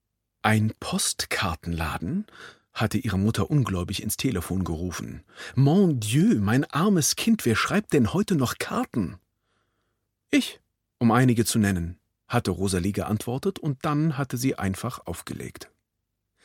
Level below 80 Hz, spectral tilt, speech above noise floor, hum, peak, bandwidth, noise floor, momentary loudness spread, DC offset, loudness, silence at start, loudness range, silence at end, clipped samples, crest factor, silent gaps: -48 dBFS; -5 dB/octave; 56 dB; none; -4 dBFS; 17 kHz; -80 dBFS; 12 LU; under 0.1%; -25 LUFS; 0.45 s; 5 LU; 0.8 s; under 0.1%; 22 dB; none